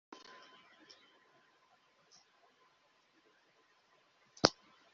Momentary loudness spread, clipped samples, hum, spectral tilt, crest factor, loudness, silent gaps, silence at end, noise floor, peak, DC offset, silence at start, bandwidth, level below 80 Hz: 29 LU; under 0.1%; none; -2 dB/octave; 42 dB; -33 LUFS; none; 0.45 s; -72 dBFS; -4 dBFS; under 0.1%; 4.45 s; 7.4 kHz; -76 dBFS